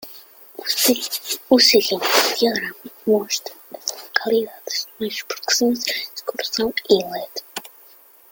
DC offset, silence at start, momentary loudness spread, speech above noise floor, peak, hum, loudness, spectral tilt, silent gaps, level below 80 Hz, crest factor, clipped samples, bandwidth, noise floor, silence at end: under 0.1%; 0 s; 15 LU; 29 dB; 0 dBFS; none; -20 LUFS; -1.5 dB/octave; none; -62 dBFS; 20 dB; under 0.1%; 17 kHz; -49 dBFS; 0.65 s